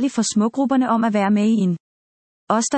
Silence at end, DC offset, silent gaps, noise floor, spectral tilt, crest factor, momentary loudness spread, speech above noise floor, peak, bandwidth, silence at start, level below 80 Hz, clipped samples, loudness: 0 s; under 0.1%; 1.80-2.47 s; under -90 dBFS; -5 dB/octave; 14 dB; 5 LU; over 72 dB; -4 dBFS; 8.8 kHz; 0 s; -68 dBFS; under 0.1%; -19 LUFS